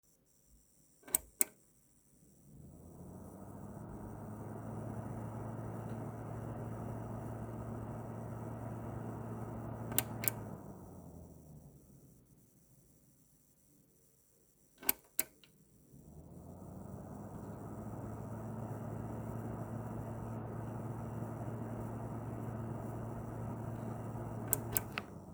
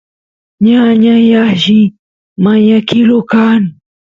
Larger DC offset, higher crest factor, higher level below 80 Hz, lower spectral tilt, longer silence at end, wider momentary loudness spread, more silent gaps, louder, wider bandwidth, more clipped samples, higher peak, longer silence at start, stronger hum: neither; first, 38 dB vs 10 dB; second, -60 dBFS vs -52 dBFS; second, -5 dB/octave vs -7 dB/octave; second, 0 s vs 0.35 s; first, 18 LU vs 6 LU; second, none vs 1.99-2.36 s; second, -42 LUFS vs -9 LUFS; first, over 20 kHz vs 7.2 kHz; neither; second, -6 dBFS vs 0 dBFS; about the same, 0.5 s vs 0.6 s; neither